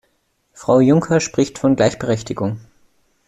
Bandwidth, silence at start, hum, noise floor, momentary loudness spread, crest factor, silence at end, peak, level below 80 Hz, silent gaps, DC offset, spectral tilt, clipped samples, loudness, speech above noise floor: 11 kHz; 0.6 s; none; -65 dBFS; 12 LU; 16 dB; 0.65 s; -2 dBFS; -50 dBFS; none; under 0.1%; -6 dB/octave; under 0.1%; -17 LUFS; 49 dB